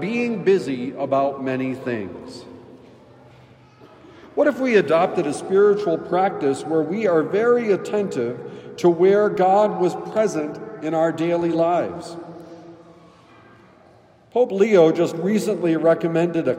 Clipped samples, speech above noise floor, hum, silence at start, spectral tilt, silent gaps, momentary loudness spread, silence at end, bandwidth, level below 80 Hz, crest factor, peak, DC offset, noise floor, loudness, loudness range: under 0.1%; 32 dB; none; 0 s; -6.5 dB/octave; none; 14 LU; 0 s; 12 kHz; -68 dBFS; 18 dB; -4 dBFS; under 0.1%; -51 dBFS; -20 LUFS; 7 LU